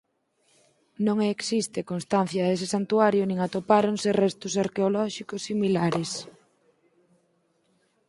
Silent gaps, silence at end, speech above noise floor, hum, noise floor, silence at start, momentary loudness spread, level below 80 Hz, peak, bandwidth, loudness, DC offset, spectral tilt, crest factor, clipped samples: none; 1.8 s; 44 dB; none; -69 dBFS; 1 s; 9 LU; -68 dBFS; -6 dBFS; 11.5 kHz; -25 LUFS; under 0.1%; -5.5 dB/octave; 22 dB; under 0.1%